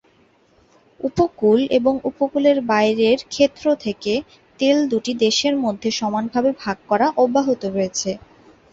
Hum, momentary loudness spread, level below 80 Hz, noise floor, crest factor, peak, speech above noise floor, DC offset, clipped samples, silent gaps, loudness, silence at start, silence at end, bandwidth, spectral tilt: none; 7 LU; -54 dBFS; -57 dBFS; 16 dB; -4 dBFS; 38 dB; under 0.1%; under 0.1%; none; -19 LUFS; 1.05 s; 0.55 s; 8 kHz; -4 dB/octave